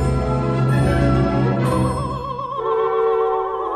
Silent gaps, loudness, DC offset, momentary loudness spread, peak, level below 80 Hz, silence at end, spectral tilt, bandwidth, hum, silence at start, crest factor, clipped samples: none; -19 LUFS; under 0.1%; 7 LU; -4 dBFS; -30 dBFS; 0 s; -8 dB/octave; 12 kHz; none; 0 s; 14 dB; under 0.1%